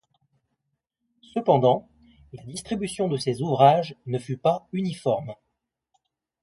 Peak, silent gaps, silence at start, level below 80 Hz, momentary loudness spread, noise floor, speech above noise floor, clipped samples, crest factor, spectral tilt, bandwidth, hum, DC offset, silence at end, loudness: -4 dBFS; none; 1.35 s; -62 dBFS; 15 LU; -80 dBFS; 57 dB; under 0.1%; 22 dB; -6.5 dB/octave; 11.5 kHz; none; under 0.1%; 1.1 s; -24 LUFS